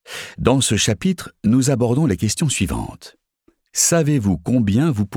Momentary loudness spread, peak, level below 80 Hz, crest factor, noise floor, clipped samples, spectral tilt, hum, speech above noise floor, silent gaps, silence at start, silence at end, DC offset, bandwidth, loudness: 8 LU; 0 dBFS; -40 dBFS; 18 dB; -62 dBFS; under 0.1%; -4.5 dB/octave; none; 44 dB; none; 0.1 s; 0 s; under 0.1%; 18.5 kHz; -18 LUFS